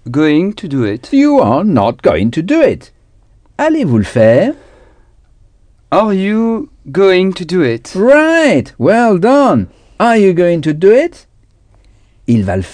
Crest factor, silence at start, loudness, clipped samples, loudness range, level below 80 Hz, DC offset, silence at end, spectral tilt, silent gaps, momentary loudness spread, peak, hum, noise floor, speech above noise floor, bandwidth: 12 dB; 0.05 s; -11 LUFS; 0.3%; 4 LU; -42 dBFS; under 0.1%; 0 s; -7 dB/octave; none; 8 LU; 0 dBFS; none; -48 dBFS; 38 dB; 10 kHz